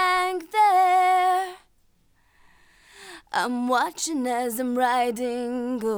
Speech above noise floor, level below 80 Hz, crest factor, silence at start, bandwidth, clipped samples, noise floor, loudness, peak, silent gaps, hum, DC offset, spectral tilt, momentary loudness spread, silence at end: 37 dB; -64 dBFS; 14 dB; 0 s; over 20 kHz; under 0.1%; -62 dBFS; -23 LUFS; -10 dBFS; none; none; under 0.1%; -2.5 dB/octave; 10 LU; 0 s